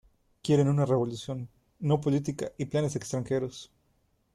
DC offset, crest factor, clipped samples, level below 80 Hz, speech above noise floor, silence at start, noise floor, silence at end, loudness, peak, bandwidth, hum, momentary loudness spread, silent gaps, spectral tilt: under 0.1%; 18 dB; under 0.1%; -62 dBFS; 43 dB; 0.45 s; -71 dBFS; 0.7 s; -29 LUFS; -12 dBFS; 12 kHz; none; 14 LU; none; -7 dB/octave